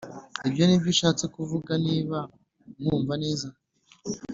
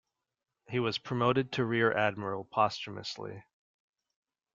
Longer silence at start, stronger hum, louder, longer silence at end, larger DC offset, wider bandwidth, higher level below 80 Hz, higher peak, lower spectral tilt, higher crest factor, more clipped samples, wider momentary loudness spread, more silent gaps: second, 0 s vs 0.7 s; neither; first, -26 LUFS vs -31 LUFS; second, 0 s vs 1.15 s; neither; about the same, 7.8 kHz vs 7.6 kHz; first, -58 dBFS vs -70 dBFS; first, -8 dBFS vs -12 dBFS; about the same, -5 dB/octave vs -6 dB/octave; about the same, 18 dB vs 22 dB; neither; first, 16 LU vs 12 LU; neither